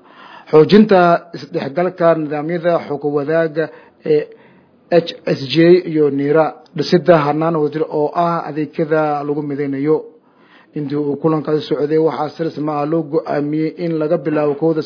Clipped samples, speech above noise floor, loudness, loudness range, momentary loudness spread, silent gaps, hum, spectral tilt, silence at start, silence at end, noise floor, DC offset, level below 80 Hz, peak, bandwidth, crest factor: under 0.1%; 33 dB; -16 LUFS; 5 LU; 10 LU; none; none; -8 dB/octave; 0.2 s; 0 s; -48 dBFS; under 0.1%; -62 dBFS; 0 dBFS; 5.4 kHz; 16 dB